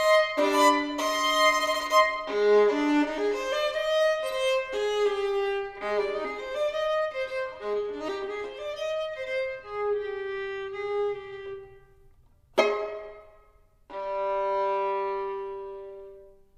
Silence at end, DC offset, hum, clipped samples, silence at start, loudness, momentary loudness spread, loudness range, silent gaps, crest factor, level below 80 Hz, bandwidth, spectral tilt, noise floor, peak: 0.25 s; under 0.1%; none; under 0.1%; 0 s; -27 LUFS; 15 LU; 9 LU; none; 20 dB; -58 dBFS; 15 kHz; -2 dB/octave; -59 dBFS; -8 dBFS